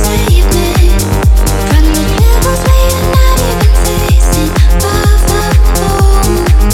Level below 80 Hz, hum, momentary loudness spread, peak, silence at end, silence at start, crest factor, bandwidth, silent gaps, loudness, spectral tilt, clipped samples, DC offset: -8 dBFS; none; 1 LU; 0 dBFS; 0 s; 0 s; 6 dB; 16.5 kHz; none; -10 LUFS; -5 dB/octave; 0.3%; under 0.1%